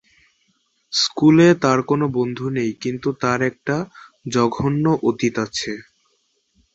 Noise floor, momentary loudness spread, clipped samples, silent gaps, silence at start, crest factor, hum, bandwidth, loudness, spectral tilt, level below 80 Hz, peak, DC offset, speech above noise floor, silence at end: -66 dBFS; 12 LU; under 0.1%; none; 0.9 s; 18 dB; none; 8.2 kHz; -19 LUFS; -5.5 dB/octave; -54 dBFS; -2 dBFS; under 0.1%; 48 dB; 0.9 s